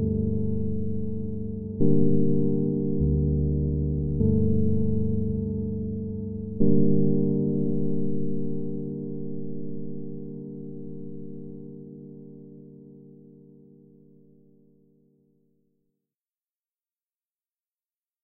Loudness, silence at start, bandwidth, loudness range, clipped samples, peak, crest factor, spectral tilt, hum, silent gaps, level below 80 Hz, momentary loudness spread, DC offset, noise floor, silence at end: -27 LUFS; 0 s; 1 kHz; 18 LU; under 0.1%; -6 dBFS; 20 dB; -13.5 dB/octave; none; none; -40 dBFS; 18 LU; under 0.1%; under -90 dBFS; 0 s